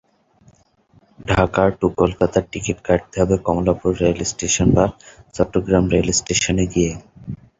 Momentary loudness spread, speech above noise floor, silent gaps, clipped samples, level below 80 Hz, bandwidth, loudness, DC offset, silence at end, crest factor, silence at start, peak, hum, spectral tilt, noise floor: 8 LU; 37 dB; none; under 0.1%; -36 dBFS; 8 kHz; -19 LUFS; under 0.1%; 0.25 s; 18 dB; 1.2 s; -2 dBFS; none; -5 dB/octave; -55 dBFS